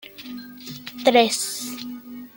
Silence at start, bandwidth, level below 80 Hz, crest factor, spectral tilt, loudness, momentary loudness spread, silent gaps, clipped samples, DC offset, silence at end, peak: 0.05 s; 17 kHz; -70 dBFS; 20 dB; -2 dB/octave; -20 LUFS; 20 LU; none; under 0.1%; under 0.1%; 0.05 s; -4 dBFS